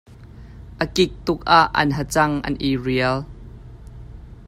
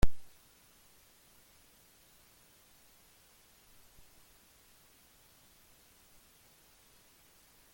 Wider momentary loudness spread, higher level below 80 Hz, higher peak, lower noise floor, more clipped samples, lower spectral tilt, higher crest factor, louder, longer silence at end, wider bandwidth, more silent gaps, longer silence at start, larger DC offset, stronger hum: first, 26 LU vs 0 LU; first, -40 dBFS vs -46 dBFS; first, 0 dBFS vs -12 dBFS; second, -41 dBFS vs -64 dBFS; neither; about the same, -5 dB/octave vs -5 dB/octave; about the same, 22 dB vs 26 dB; first, -20 LUFS vs -56 LUFS; second, 0.05 s vs 7.5 s; about the same, 16 kHz vs 17 kHz; neither; about the same, 0.1 s vs 0.05 s; neither; neither